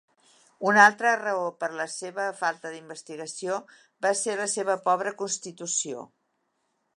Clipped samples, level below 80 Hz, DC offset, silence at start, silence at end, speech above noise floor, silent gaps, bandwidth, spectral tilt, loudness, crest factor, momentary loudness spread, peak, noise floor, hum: under 0.1%; -84 dBFS; under 0.1%; 0.6 s; 0.9 s; 49 dB; none; 11.5 kHz; -2 dB/octave; -26 LUFS; 24 dB; 19 LU; -4 dBFS; -75 dBFS; none